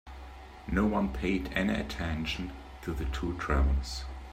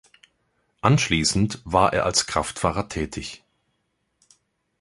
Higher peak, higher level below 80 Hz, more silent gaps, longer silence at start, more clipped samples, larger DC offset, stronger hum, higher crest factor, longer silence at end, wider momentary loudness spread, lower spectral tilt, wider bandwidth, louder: second, -14 dBFS vs -2 dBFS; first, -36 dBFS vs -44 dBFS; neither; second, 0.05 s vs 0.85 s; neither; neither; neither; about the same, 18 dB vs 22 dB; second, 0 s vs 1.45 s; first, 14 LU vs 11 LU; first, -6 dB/octave vs -4 dB/octave; first, 14.5 kHz vs 11.5 kHz; second, -32 LUFS vs -22 LUFS